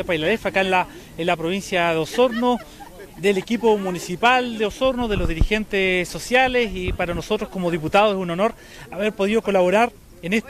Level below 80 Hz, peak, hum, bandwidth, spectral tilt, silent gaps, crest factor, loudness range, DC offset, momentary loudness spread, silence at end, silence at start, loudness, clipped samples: -34 dBFS; -4 dBFS; none; 15 kHz; -5 dB/octave; none; 16 dB; 1 LU; under 0.1%; 8 LU; 0 s; 0 s; -21 LUFS; under 0.1%